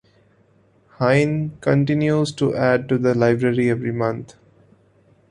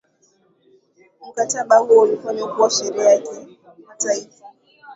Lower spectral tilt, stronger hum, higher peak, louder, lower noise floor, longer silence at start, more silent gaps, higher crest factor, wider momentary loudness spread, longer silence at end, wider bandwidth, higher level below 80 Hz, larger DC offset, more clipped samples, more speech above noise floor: first, -7.5 dB/octave vs -2 dB/octave; neither; about the same, -2 dBFS vs -2 dBFS; about the same, -19 LUFS vs -17 LUFS; about the same, -57 dBFS vs -60 dBFS; second, 1 s vs 1.25 s; neither; about the same, 18 dB vs 18 dB; second, 6 LU vs 14 LU; first, 1.05 s vs 0 s; first, 11 kHz vs 8 kHz; first, -56 dBFS vs -74 dBFS; neither; neither; second, 38 dB vs 42 dB